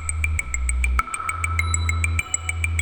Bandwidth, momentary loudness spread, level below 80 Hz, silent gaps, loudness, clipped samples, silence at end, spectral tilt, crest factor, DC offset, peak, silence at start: 19 kHz; 3 LU; -26 dBFS; none; -23 LUFS; under 0.1%; 0 s; -2.5 dB/octave; 20 dB; 0.4%; -4 dBFS; 0 s